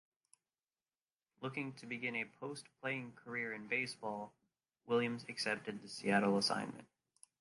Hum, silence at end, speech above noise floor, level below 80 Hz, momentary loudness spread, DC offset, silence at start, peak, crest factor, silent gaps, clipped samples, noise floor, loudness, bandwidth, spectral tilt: none; 0.55 s; over 50 dB; -84 dBFS; 14 LU; under 0.1%; 1.4 s; -20 dBFS; 22 dB; none; under 0.1%; under -90 dBFS; -40 LUFS; 11.5 kHz; -4.5 dB/octave